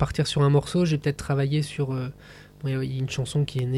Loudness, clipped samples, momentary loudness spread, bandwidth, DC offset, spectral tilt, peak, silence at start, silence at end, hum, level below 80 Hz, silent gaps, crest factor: -25 LUFS; under 0.1%; 9 LU; 12 kHz; under 0.1%; -6.5 dB/octave; -10 dBFS; 0 s; 0 s; 50 Hz at -50 dBFS; -48 dBFS; none; 14 dB